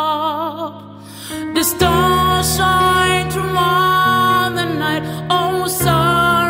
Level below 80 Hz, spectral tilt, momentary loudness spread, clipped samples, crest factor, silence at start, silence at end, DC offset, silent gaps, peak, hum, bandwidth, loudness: -36 dBFS; -4 dB/octave; 13 LU; under 0.1%; 14 dB; 0 s; 0 s; under 0.1%; none; -2 dBFS; none; 16.5 kHz; -15 LUFS